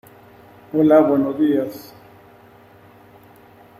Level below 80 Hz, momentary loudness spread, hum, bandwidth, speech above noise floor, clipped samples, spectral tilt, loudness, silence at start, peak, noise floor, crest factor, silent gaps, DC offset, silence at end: -64 dBFS; 15 LU; none; 15 kHz; 31 dB; under 0.1%; -8 dB/octave; -17 LUFS; 0.75 s; -2 dBFS; -47 dBFS; 18 dB; none; under 0.1%; 2 s